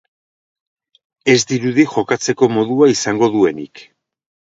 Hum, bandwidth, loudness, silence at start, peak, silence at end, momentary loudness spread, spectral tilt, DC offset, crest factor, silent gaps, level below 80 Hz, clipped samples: none; 7.8 kHz; -15 LUFS; 1.25 s; 0 dBFS; 0.75 s; 6 LU; -4.5 dB/octave; under 0.1%; 16 dB; none; -58 dBFS; under 0.1%